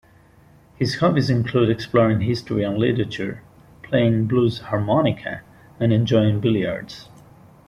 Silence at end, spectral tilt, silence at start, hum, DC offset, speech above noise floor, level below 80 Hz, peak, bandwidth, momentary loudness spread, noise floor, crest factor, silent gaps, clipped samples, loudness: 0.65 s; -7.5 dB/octave; 0.8 s; none; under 0.1%; 32 dB; -50 dBFS; -4 dBFS; 11.5 kHz; 12 LU; -51 dBFS; 16 dB; none; under 0.1%; -21 LUFS